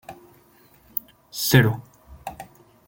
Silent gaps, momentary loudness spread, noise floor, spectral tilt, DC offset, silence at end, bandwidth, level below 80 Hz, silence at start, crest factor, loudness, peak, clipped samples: none; 26 LU; -55 dBFS; -5 dB/octave; under 0.1%; 0.45 s; 17 kHz; -52 dBFS; 0.1 s; 24 dB; -22 LUFS; -2 dBFS; under 0.1%